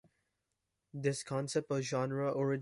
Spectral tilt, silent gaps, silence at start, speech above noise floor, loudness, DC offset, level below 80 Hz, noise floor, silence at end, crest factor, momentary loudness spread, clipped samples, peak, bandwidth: -5.5 dB/octave; none; 0.95 s; 51 dB; -36 LUFS; under 0.1%; -76 dBFS; -86 dBFS; 0 s; 16 dB; 4 LU; under 0.1%; -20 dBFS; 11.5 kHz